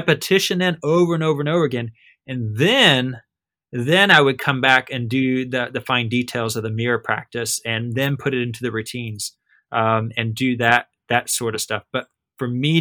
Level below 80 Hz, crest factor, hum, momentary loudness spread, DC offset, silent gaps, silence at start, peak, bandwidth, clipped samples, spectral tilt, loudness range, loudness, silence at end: -62 dBFS; 20 dB; none; 14 LU; under 0.1%; none; 0 s; 0 dBFS; over 20 kHz; under 0.1%; -4.5 dB/octave; 6 LU; -19 LUFS; 0 s